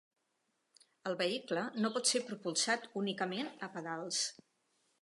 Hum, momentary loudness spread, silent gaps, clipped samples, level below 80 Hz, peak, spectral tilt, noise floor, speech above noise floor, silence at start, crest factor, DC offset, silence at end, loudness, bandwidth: none; 9 LU; none; under 0.1%; -90 dBFS; -18 dBFS; -2.5 dB/octave; -82 dBFS; 45 dB; 1.05 s; 20 dB; under 0.1%; 0.7 s; -36 LUFS; 11.5 kHz